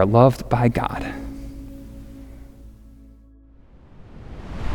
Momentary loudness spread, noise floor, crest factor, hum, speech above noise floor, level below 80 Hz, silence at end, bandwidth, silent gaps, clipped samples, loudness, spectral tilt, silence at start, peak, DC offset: 27 LU; -48 dBFS; 22 dB; none; 31 dB; -38 dBFS; 0 s; 17 kHz; none; under 0.1%; -20 LUFS; -8.5 dB/octave; 0 s; -2 dBFS; under 0.1%